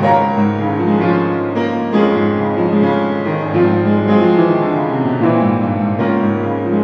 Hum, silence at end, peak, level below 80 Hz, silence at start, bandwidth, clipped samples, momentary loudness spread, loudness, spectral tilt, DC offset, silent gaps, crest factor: none; 0 s; 0 dBFS; -58 dBFS; 0 s; 6.2 kHz; under 0.1%; 5 LU; -15 LUFS; -9.5 dB/octave; under 0.1%; none; 14 dB